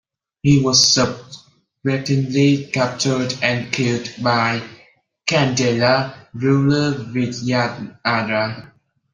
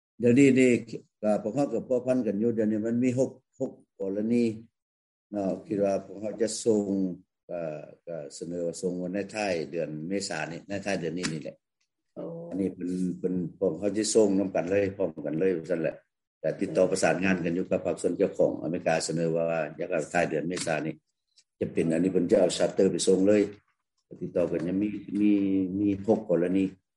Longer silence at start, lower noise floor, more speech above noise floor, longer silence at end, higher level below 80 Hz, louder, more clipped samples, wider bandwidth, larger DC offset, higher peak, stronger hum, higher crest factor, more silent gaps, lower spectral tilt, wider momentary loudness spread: first, 0.45 s vs 0.2 s; second, -53 dBFS vs -81 dBFS; second, 35 dB vs 54 dB; first, 0.45 s vs 0.25 s; first, -52 dBFS vs -68 dBFS; first, -18 LUFS vs -28 LUFS; neither; second, 9.8 kHz vs 11.5 kHz; neither; first, 0 dBFS vs -8 dBFS; neither; about the same, 18 dB vs 20 dB; second, none vs 4.82-5.30 s, 7.43-7.48 s, 16.27-16.41 s; about the same, -4.5 dB/octave vs -5.5 dB/octave; about the same, 11 LU vs 13 LU